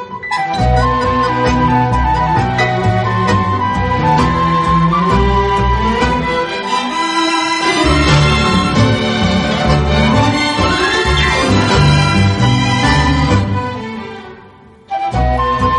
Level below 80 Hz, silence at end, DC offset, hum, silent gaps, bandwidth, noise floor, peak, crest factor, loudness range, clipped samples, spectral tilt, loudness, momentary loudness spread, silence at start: -22 dBFS; 0 s; under 0.1%; none; none; 11.5 kHz; -40 dBFS; 0 dBFS; 12 dB; 2 LU; under 0.1%; -5.5 dB/octave; -13 LUFS; 6 LU; 0 s